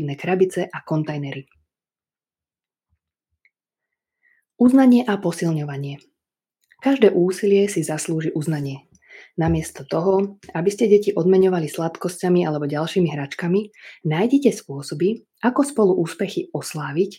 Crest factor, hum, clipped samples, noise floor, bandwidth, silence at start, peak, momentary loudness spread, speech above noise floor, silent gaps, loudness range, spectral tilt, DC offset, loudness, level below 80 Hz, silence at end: 20 dB; none; under 0.1%; under -90 dBFS; 16 kHz; 0 s; -2 dBFS; 13 LU; over 70 dB; none; 6 LU; -6.5 dB/octave; under 0.1%; -20 LUFS; -52 dBFS; 0.05 s